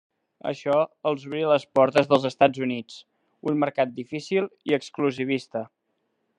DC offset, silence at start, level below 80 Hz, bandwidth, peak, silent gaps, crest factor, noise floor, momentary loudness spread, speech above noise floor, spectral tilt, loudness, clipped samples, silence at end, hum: under 0.1%; 0.45 s; -76 dBFS; 10 kHz; -2 dBFS; none; 22 dB; -75 dBFS; 14 LU; 51 dB; -6 dB/octave; -25 LUFS; under 0.1%; 0.7 s; none